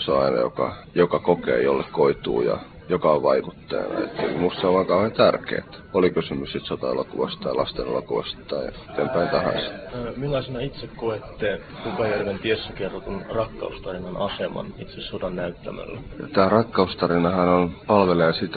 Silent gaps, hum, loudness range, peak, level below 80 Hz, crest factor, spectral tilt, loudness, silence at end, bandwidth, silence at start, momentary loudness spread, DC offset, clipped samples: none; none; 6 LU; -2 dBFS; -48 dBFS; 20 dB; -10.5 dB/octave; -24 LUFS; 0 s; 4.9 kHz; 0 s; 12 LU; under 0.1%; under 0.1%